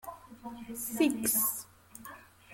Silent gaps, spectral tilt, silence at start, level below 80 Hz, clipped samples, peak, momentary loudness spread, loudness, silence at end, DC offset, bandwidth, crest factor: none; -2.5 dB/octave; 0.05 s; -68 dBFS; under 0.1%; -16 dBFS; 22 LU; -30 LUFS; 0 s; under 0.1%; 17 kHz; 20 dB